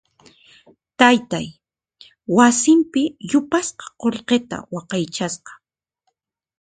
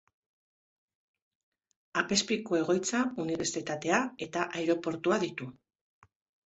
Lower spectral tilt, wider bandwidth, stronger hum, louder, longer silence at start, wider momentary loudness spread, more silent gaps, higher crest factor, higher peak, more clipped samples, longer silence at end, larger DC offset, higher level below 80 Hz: about the same, -3.5 dB/octave vs -3.5 dB/octave; first, 9.6 kHz vs 8.4 kHz; neither; first, -19 LUFS vs -31 LUFS; second, 1 s vs 1.95 s; first, 15 LU vs 7 LU; neither; about the same, 20 dB vs 22 dB; first, 0 dBFS vs -12 dBFS; neither; first, 1.1 s vs 0.95 s; neither; first, -60 dBFS vs -72 dBFS